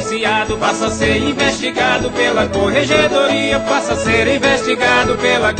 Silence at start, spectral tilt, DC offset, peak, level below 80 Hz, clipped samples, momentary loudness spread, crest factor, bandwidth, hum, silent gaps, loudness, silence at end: 0 s; -4 dB/octave; under 0.1%; 0 dBFS; -36 dBFS; under 0.1%; 3 LU; 14 dB; 9.2 kHz; none; none; -14 LUFS; 0 s